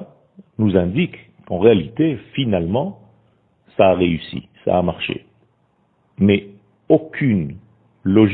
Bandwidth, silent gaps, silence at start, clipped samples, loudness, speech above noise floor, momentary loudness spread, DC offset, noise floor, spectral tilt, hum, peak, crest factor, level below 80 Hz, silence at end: 4.4 kHz; none; 0 s; under 0.1%; -19 LUFS; 45 dB; 13 LU; under 0.1%; -62 dBFS; -12 dB/octave; none; 0 dBFS; 20 dB; -48 dBFS; 0 s